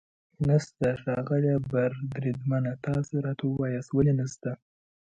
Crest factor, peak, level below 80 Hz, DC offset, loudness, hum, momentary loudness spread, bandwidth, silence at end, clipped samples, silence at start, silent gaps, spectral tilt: 18 dB; -10 dBFS; -56 dBFS; under 0.1%; -28 LUFS; none; 6 LU; 8.2 kHz; 0.5 s; under 0.1%; 0.4 s; none; -8 dB/octave